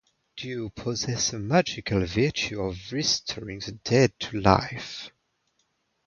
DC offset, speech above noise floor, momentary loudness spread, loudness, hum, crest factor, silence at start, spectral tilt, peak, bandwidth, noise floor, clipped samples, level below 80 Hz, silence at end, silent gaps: under 0.1%; 47 dB; 14 LU; -26 LUFS; none; 26 dB; 0.35 s; -4.5 dB/octave; -2 dBFS; 7.4 kHz; -73 dBFS; under 0.1%; -48 dBFS; 1 s; none